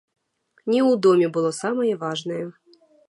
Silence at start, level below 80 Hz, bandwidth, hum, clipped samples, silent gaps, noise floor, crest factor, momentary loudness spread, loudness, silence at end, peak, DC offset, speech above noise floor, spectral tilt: 0.65 s; -76 dBFS; 11.5 kHz; none; under 0.1%; none; -65 dBFS; 16 dB; 14 LU; -21 LUFS; 0.55 s; -6 dBFS; under 0.1%; 44 dB; -5.5 dB/octave